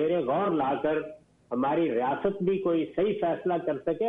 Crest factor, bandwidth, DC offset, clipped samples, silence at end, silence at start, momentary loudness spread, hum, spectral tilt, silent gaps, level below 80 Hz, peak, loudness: 12 dB; 3.9 kHz; under 0.1%; under 0.1%; 0 s; 0 s; 4 LU; none; -9 dB/octave; none; -64 dBFS; -14 dBFS; -28 LUFS